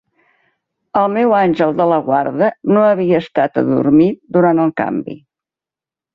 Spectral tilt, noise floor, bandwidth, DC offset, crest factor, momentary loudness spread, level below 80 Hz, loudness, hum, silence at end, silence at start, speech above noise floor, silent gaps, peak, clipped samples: -9.5 dB/octave; -89 dBFS; 5.6 kHz; under 0.1%; 14 dB; 7 LU; -56 dBFS; -14 LUFS; none; 1 s; 0.95 s; 75 dB; none; -2 dBFS; under 0.1%